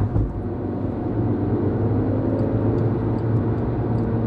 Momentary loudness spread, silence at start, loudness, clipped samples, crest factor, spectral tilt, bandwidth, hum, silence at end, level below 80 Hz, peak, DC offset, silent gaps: 5 LU; 0 s; -23 LUFS; under 0.1%; 14 dB; -12 dB/octave; 4.6 kHz; none; 0 s; -34 dBFS; -8 dBFS; under 0.1%; none